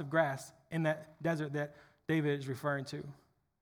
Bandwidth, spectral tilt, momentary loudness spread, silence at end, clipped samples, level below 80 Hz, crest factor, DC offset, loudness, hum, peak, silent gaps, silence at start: over 20 kHz; -6.5 dB/octave; 12 LU; 0.5 s; under 0.1%; -76 dBFS; 20 dB; under 0.1%; -36 LUFS; none; -16 dBFS; none; 0 s